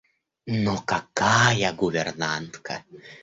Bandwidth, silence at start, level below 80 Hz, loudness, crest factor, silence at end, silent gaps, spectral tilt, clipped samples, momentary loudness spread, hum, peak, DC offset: 8 kHz; 0.45 s; -54 dBFS; -23 LUFS; 20 dB; 0.05 s; none; -4 dB/octave; under 0.1%; 16 LU; none; -6 dBFS; under 0.1%